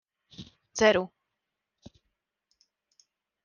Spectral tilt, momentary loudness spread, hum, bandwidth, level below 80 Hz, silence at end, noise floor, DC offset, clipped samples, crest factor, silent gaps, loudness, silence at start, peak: -3.5 dB/octave; 25 LU; none; 10 kHz; -64 dBFS; 2.4 s; -85 dBFS; under 0.1%; under 0.1%; 24 dB; none; -25 LUFS; 0.4 s; -10 dBFS